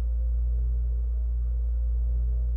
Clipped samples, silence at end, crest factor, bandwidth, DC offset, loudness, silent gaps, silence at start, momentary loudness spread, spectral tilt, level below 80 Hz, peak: under 0.1%; 0 s; 4 dB; 0.8 kHz; under 0.1%; -29 LUFS; none; 0 s; 1 LU; -11.5 dB/octave; -26 dBFS; -20 dBFS